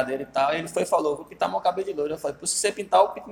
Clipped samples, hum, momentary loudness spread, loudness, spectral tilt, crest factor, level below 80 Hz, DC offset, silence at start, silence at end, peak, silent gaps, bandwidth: under 0.1%; none; 7 LU; -25 LUFS; -2.5 dB/octave; 20 dB; -62 dBFS; under 0.1%; 0 s; 0 s; -4 dBFS; none; 17 kHz